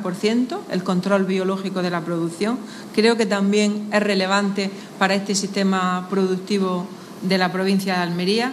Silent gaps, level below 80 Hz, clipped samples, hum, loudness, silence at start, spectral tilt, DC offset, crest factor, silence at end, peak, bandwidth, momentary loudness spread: none; -70 dBFS; under 0.1%; none; -21 LUFS; 0 s; -5 dB/octave; under 0.1%; 18 dB; 0 s; -2 dBFS; 13.5 kHz; 7 LU